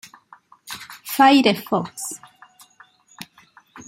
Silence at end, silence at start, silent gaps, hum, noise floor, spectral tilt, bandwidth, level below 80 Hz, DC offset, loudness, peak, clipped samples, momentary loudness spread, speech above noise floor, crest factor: 0.05 s; 0.65 s; none; none; -53 dBFS; -3.5 dB/octave; 16.5 kHz; -70 dBFS; under 0.1%; -18 LUFS; -2 dBFS; under 0.1%; 27 LU; 36 dB; 22 dB